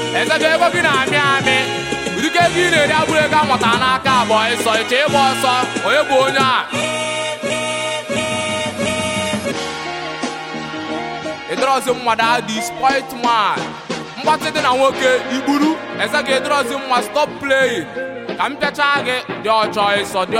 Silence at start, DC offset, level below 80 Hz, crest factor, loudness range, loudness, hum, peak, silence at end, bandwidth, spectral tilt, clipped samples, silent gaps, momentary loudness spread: 0 s; under 0.1%; -52 dBFS; 16 dB; 6 LU; -16 LUFS; none; 0 dBFS; 0 s; 16.5 kHz; -3 dB/octave; under 0.1%; none; 10 LU